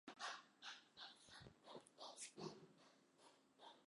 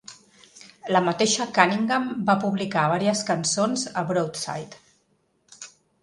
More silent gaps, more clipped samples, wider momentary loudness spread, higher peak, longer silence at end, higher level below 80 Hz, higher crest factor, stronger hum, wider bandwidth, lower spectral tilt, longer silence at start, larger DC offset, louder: neither; neither; second, 13 LU vs 22 LU; second, -38 dBFS vs 0 dBFS; second, 0 s vs 0.35 s; second, -88 dBFS vs -66 dBFS; about the same, 22 dB vs 24 dB; neither; about the same, 11.5 kHz vs 11.5 kHz; second, -2 dB/octave vs -4 dB/octave; about the same, 0.05 s vs 0.1 s; neither; second, -58 LUFS vs -23 LUFS